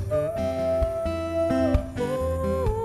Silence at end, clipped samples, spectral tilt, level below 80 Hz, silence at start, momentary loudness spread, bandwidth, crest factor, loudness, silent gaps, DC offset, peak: 0 s; under 0.1%; -7.5 dB/octave; -34 dBFS; 0 s; 4 LU; 13 kHz; 16 dB; -26 LUFS; none; under 0.1%; -8 dBFS